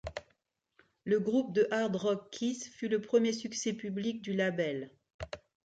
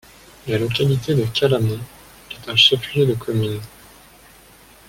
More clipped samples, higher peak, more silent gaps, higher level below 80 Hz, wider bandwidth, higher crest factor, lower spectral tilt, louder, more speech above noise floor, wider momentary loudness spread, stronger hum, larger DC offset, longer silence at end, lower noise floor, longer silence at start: neither; second, -16 dBFS vs -2 dBFS; first, 5.14-5.19 s vs none; second, -62 dBFS vs -50 dBFS; second, 9.2 kHz vs 17 kHz; about the same, 18 dB vs 20 dB; about the same, -5 dB/octave vs -5.5 dB/octave; second, -33 LUFS vs -18 LUFS; first, 45 dB vs 29 dB; second, 16 LU vs 22 LU; neither; neither; second, 0.35 s vs 1.2 s; first, -77 dBFS vs -47 dBFS; second, 0.05 s vs 0.45 s